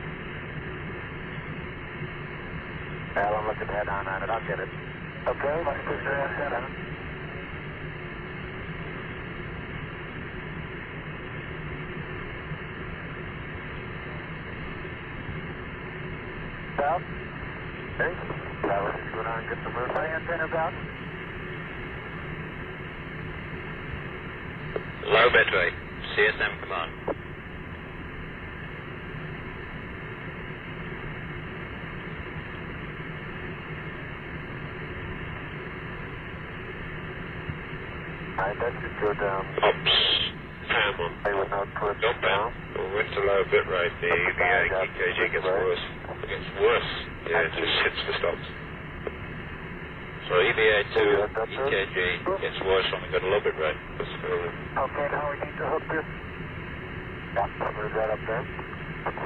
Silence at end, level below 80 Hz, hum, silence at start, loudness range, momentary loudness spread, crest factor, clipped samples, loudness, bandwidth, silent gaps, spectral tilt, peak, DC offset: 0 s; -46 dBFS; none; 0 s; 11 LU; 13 LU; 20 dB; under 0.1%; -29 LUFS; 4.9 kHz; none; -7.5 dB/octave; -10 dBFS; under 0.1%